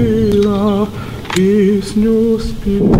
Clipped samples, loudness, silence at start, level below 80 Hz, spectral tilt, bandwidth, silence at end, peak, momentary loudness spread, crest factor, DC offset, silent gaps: under 0.1%; -14 LUFS; 0 s; -28 dBFS; -7 dB/octave; 16 kHz; 0 s; 0 dBFS; 7 LU; 12 dB; 0.5%; none